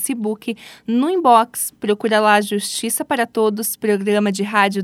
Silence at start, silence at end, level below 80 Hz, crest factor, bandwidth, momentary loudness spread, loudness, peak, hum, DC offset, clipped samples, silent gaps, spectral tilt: 0 s; 0 s; -68 dBFS; 18 dB; 17 kHz; 9 LU; -18 LUFS; 0 dBFS; none; under 0.1%; under 0.1%; none; -3.5 dB/octave